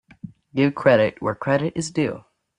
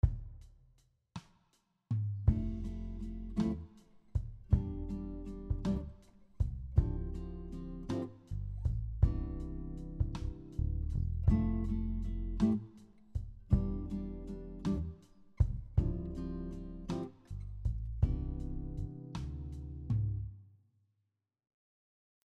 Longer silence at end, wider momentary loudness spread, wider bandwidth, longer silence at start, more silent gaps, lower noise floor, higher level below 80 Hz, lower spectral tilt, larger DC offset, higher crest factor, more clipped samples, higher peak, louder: second, 0.4 s vs 1.8 s; about the same, 10 LU vs 12 LU; first, 10.5 kHz vs 8.4 kHz; first, 0.25 s vs 0.05 s; neither; second, -42 dBFS vs -84 dBFS; second, -58 dBFS vs -40 dBFS; second, -6 dB/octave vs -9.5 dB/octave; neither; about the same, 20 dB vs 22 dB; neither; first, -2 dBFS vs -14 dBFS; first, -21 LUFS vs -38 LUFS